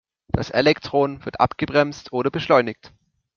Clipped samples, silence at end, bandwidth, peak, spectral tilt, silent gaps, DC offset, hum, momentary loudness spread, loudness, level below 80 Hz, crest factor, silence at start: under 0.1%; 0.65 s; 7 kHz; -2 dBFS; -6 dB/octave; none; under 0.1%; none; 9 LU; -21 LUFS; -48 dBFS; 20 dB; 0.35 s